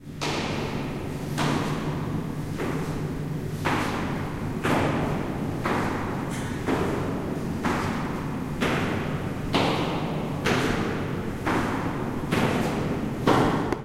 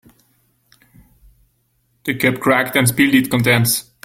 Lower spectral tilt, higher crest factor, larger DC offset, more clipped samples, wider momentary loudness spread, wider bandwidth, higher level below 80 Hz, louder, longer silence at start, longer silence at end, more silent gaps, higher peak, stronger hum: first, -6 dB/octave vs -4.5 dB/octave; about the same, 20 dB vs 18 dB; neither; neither; about the same, 6 LU vs 5 LU; about the same, 16 kHz vs 17 kHz; first, -42 dBFS vs -52 dBFS; second, -27 LUFS vs -15 LUFS; second, 0 s vs 2.05 s; second, 0 s vs 0.25 s; neither; second, -8 dBFS vs 0 dBFS; neither